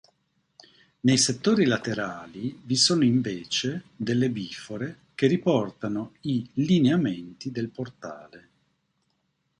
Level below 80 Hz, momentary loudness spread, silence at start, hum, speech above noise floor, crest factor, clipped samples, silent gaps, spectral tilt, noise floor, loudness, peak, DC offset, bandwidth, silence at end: -64 dBFS; 14 LU; 1.05 s; none; 49 dB; 18 dB; under 0.1%; none; -4.5 dB/octave; -74 dBFS; -25 LUFS; -8 dBFS; under 0.1%; 11.5 kHz; 1.2 s